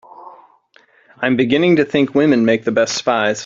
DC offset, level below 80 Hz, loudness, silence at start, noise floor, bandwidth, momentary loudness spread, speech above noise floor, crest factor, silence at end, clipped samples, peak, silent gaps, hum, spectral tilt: under 0.1%; -56 dBFS; -15 LUFS; 0.2 s; -53 dBFS; 7.8 kHz; 3 LU; 38 dB; 16 dB; 0 s; under 0.1%; 0 dBFS; none; none; -5 dB/octave